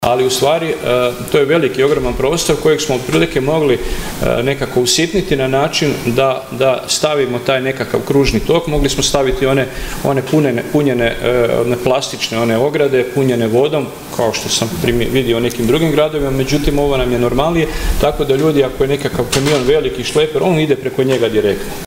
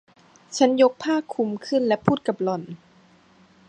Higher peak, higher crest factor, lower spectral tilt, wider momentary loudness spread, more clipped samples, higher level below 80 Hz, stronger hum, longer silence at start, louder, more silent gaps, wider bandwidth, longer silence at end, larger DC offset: about the same, 0 dBFS vs -2 dBFS; second, 14 dB vs 22 dB; about the same, -4.5 dB/octave vs -5.5 dB/octave; second, 4 LU vs 14 LU; neither; first, -28 dBFS vs -66 dBFS; neither; second, 0 s vs 0.5 s; first, -14 LUFS vs -23 LUFS; neither; first, 16.5 kHz vs 9.6 kHz; second, 0 s vs 0.95 s; neither